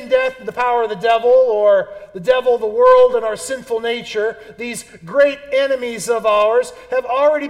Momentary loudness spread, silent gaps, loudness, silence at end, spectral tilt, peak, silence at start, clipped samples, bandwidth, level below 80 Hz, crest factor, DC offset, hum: 12 LU; none; -16 LUFS; 0 s; -3 dB/octave; -2 dBFS; 0 s; under 0.1%; 13.5 kHz; -54 dBFS; 14 dB; under 0.1%; none